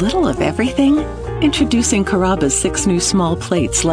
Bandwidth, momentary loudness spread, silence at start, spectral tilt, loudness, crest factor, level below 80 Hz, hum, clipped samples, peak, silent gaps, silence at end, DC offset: 11 kHz; 3 LU; 0 s; -4.5 dB/octave; -16 LUFS; 12 dB; -30 dBFS; none; under 0.1%; -4 dBFS; none; 0 s; under 0.1%